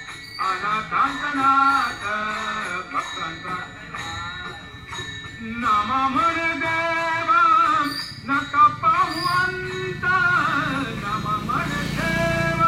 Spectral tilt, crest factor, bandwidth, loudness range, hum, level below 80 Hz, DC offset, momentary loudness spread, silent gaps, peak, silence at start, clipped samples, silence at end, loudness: -4.5 dB/octave; 16 dB; 16 kHz; 8 LU; none; -46 dBFS; under 0.1%; 14 LU; none; -6 dBFS; 0 s; under 0.1%; 0 s; -21 LUFS